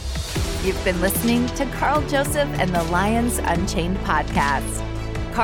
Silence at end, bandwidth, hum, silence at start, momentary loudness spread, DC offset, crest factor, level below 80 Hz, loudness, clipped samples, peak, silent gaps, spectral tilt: 0 s; 17.5 kHz; none; 0 s; 7 LU; under 0.1%; 16 dB; -30 dBFS; -22 LUFS; under 0.1%; -6 dBFS; none; -5 dB/octave